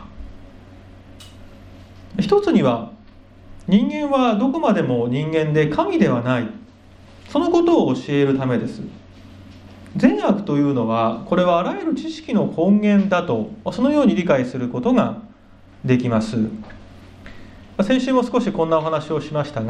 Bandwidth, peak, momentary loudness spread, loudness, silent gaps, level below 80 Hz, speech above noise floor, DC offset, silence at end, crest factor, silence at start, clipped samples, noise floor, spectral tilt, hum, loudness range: 9.4 kHz; 0 dBFS; 11 LU; -19 LUFS; none; -48 dBFS; 28 dB; under 0.1%; 0 s; 20 dB; 0 s; under 0.1%; -46 dBFS; -7.5 dB/octave; none; 4 LU